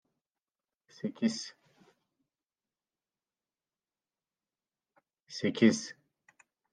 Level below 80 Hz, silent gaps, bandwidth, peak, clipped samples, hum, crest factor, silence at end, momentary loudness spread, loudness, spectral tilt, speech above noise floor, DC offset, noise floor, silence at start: -84 dBFS; none; 9.6 kHz; -10 dBFS; under 0.1%; none; 26 dB; 0.8 s; 19 LU; -31 LUFS; -4.5 dB/octave; over 60 dB; under 0.1%; under -90 dBFS; 1.05 s